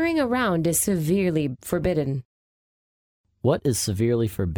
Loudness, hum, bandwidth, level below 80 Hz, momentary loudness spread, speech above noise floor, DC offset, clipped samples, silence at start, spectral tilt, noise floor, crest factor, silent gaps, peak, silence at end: -23 LUFS; none; over 20 kHz; -46 dBFS; 5 LU; over 67 dB; under 0.1%; under 0.1%; 0 s; -5.5 dB/octave; under -90 dBFS; 16 dB; 2.25-3.24 s; -8 dBFS; 0 s